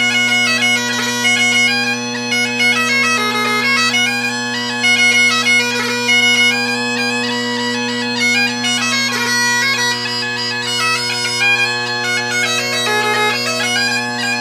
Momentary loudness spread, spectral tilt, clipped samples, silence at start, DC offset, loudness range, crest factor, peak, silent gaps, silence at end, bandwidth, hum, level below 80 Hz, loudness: 7 LU; -1.5 dB/octave; under 0.1%; 0 s; under 0.1%; 3 LU; 14 dB; -2 dBFS; none; 0 s; 16 kHz; none; -62 dBFS; -13 LUFS